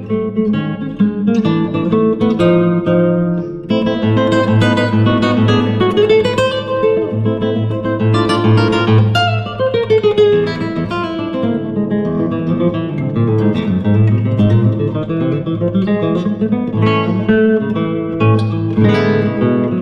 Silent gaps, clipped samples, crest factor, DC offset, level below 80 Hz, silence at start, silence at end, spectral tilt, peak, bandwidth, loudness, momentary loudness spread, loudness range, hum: none; under 0.1%; 12 dB; under 0.1%; -42 dBFS; 0 s; 0 s; -8 dB/octave; -2 dBFS; 9.4 kHz; -14 LUFS; 6 LU; 2 LU; none